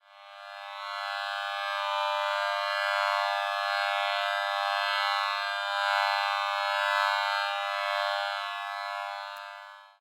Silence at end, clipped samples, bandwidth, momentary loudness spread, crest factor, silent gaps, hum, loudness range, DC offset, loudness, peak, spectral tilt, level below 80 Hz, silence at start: 0.1 s; under 0.1%; 16 kHz; 13 LU; 20 dB; none; none; 2 LU; under 0.1%; -28 LUFS; -10 dBFS; 6 dB/octave; under -90 dBFS; 0.1 s